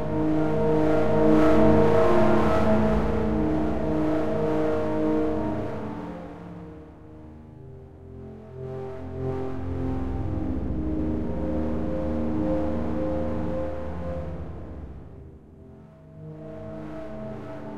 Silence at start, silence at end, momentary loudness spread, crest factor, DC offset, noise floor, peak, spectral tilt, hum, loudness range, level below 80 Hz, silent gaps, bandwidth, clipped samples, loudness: 0 s; 0 s; 23 LU; 20 dB; 2%; -47 dBFS; -6 dBFS; -8.5 dB/octave; none; 17 LU; -38 dBFS; none; 9.6 kHz; under 0.1%; -25 LUFS